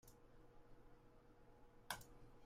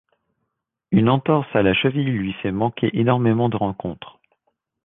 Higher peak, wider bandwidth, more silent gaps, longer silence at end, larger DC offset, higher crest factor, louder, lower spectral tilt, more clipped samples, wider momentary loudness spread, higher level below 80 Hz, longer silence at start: second, -28 dBFS vs -2 dBFS; first, 15.5 kHz vs 4 kHz; neither; second, 0 s vs 0.75 s; neither; first, 32 dB vs 18 dB; second, -54 LUFS vs -20 LUFS; second, -2.5 dB/octave vs -10.5 dB/octave; neither; first, 17 LU vs 8 LU; second, -70 dBFS vs -50 dBFS; second, 0.05 s vs 0.9 s